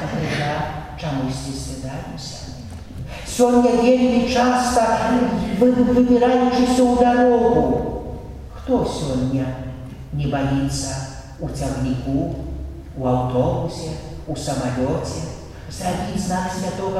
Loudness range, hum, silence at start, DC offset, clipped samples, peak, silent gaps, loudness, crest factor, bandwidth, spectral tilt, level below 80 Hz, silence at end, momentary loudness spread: 8 LU; none; 0 s; under 0.1%; under 0.1%; -4 dBFS; none; -20 LUFS; 16 dB; 13.5 kHz; -6 dB/octave; -36 dBFS; 0 s; 17 LU